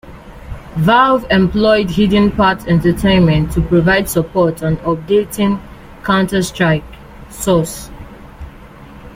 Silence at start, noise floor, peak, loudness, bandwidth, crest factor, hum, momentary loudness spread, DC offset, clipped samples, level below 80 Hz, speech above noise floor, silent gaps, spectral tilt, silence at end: 0.05 s; -36 dBFS; -2 dBFS; -14 LUFS; 16 kHz; 14 dB; none; 16 LU; under 0.1%; under 0.1%; -32 dBFS; 23 dB; none; -6 dB/octave; 0 s